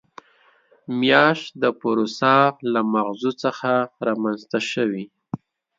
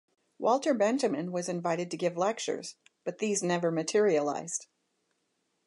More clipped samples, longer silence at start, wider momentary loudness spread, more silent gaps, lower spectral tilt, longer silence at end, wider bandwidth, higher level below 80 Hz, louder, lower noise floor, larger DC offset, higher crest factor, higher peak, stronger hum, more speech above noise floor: neither; first, 0.9 s vs 0.4 s; first, 14 LU vs 11 LU; neither; about the same, -5.5 dB/octave vs -4.5 dB/octave; second, 0.4 s vs 1.05 s; second, 7.8 kHz vs 11.5 kHz; first, -70 dBFS vs -84 dBFS; first, -21 LUFS vs -30 LUFS; second, -58 dBFS vs -78 dBFS; neither; about the same, 20 dB vs 16 dB; first, 0 dBFS vs -14 dBFS; neither; second, 38 dB vs 48 dB